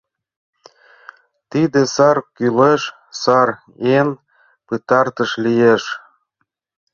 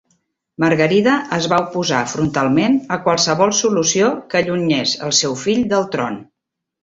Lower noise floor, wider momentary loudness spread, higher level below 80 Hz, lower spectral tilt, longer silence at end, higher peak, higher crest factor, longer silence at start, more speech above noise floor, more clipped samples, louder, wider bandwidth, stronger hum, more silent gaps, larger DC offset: second, -72 dBFS vs -80 dBFS; first, 13 LU vs 5 LU; second, -60 dBFS vs -54 dBFS; first, -5.5 dB/octave vs -3.5 dB/octave; first, 0.95 s vs 0.6 s; about the same, -2 dBFS vs -2 dBFS; about the same, 16 dB vs 16 dB; first, 1.55 s vs 0.6 s; second, 57 dB vs 64 dB; neither; about the same, -16 LUFS vs -16 LUFS; second, 7.2 kHz vs 8 kHz; neither; neither; neither